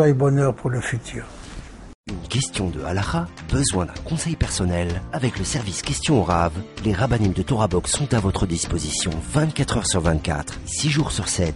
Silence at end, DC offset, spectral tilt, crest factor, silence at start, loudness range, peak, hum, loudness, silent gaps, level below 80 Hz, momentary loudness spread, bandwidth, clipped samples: 0 s; under 0.1%; -5 dB/octave; 16 dB; 0 s; 4 LU; -6 dBFS; none; -22 LUFS; 1.95-2.04 s; -34 dBFS; 8 LU; 11.5 kHz; under 0.1%